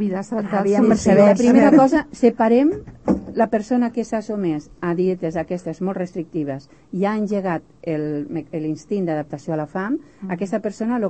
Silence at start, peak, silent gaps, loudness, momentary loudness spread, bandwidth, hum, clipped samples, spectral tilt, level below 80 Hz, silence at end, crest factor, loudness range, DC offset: 0 s; -2 dBFS; none; -20 LUFS; 14 LU; 8.6 kHz; none; under 0.1%; -7.5 dB/octave; -50 dBFS; 0 s; 18 dB; 9 LU; 0.2%